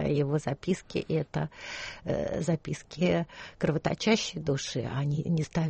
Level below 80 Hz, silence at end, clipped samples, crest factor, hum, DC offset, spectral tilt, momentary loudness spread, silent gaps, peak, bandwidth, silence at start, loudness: -54 dBFS; 0 s; under 0.1%; 18 dB; none; under 0.1%; -6 dB/octave; 9 LU; none; -12 dBFS; 8.4 kHz; 0 s; -31 LUFS